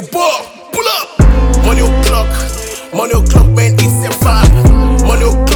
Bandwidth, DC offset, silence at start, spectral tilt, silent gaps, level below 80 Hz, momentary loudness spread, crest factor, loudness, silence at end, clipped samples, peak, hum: 19 kHz; under 0.1%; 0 s; -5.5 dB/octave; none; -12 dBFS; 9 LU; 8 dB; -11 LUFS; 0 s; 0.9%; 0 dBFS; none